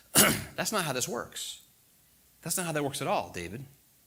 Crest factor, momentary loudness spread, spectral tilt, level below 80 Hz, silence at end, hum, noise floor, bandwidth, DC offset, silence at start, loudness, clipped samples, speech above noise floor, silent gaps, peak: 26 dB; 18 LU; -2.5 dB/octave; -60 dBFS; 0.4 s; none; -63 dBFS; 19 kHz; under 0.1%; 0.15 s; -29 LUFS; under 0.1%; 31 dB; none; -6 dBFS